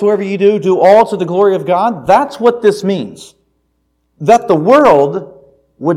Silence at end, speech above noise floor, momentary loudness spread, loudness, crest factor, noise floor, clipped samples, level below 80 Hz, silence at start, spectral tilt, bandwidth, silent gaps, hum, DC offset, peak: 0 s; 52 dB; 11 LU; -11 LUFS; 12 dB; -62 dBFS; 0.9%; -52 dBFS; 0 s; -6.5 dB/octave; 13 kHz; none; none; under 0.1%; 0 dBFS